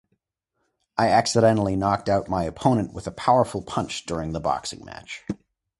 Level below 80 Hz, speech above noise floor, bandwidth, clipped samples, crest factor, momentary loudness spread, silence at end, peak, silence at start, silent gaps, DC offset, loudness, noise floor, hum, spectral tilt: -48 dBFS; 54 dB; 11.5 kHz; under 0.1%; 20 dB; 15 LU; 0.45 s; -4 dBFS; 0.95 s; none; under 0.1%; -23 LUFS; -77 dBFS; none; -5.5 dB/octave